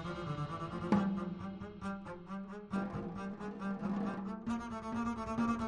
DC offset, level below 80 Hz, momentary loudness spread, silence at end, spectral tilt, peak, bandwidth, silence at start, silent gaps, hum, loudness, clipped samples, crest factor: under 0.1%; -58 dBFS; 11 LU; 0 s; -7.5 dB/octave; -16 dBFS; 10.5 kHz; 0 s; none; none; -39 LUFS; under 0.1%; 22 dB